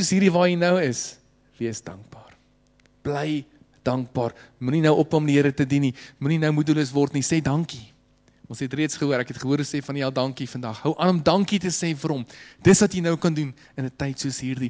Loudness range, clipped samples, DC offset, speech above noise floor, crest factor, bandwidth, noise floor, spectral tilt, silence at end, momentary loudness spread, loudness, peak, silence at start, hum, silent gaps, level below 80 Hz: 6 LU; under 0.1%; under 0.1%; 37 dB; 18 dB; 8 kHz; -60 dBFS; -5.5 dB/octave; 0 s; 13 LU; -23 LUFS; -6 dBFS; 0 s; none; none; -54 dBFS